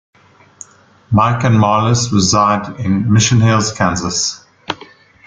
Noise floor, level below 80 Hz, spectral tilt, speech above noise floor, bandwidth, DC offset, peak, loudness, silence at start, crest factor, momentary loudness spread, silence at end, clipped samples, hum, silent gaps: -42 dBFS; -44 dBFS; -4.5 dB/octave; 29 dB; 9.4 kHz; under 0.1%; 0 dBFS; -13 LUFS; 1.1 s; 14 dB; 15 LU; 0.5 s; under 0.1%; none; none